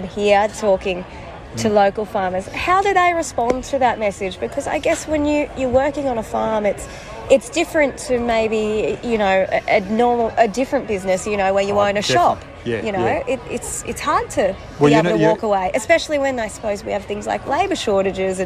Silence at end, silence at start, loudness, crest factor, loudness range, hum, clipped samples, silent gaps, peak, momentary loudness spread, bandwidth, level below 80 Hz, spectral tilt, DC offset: 0 s; 0 s; -19 LUFS; 16 dB; 2 LU; none; under 0.1%; none; -2 dBFS; 8 LU; 14.5 kHz; -42 dBFS; -4.5 dB/octave; under 0.1%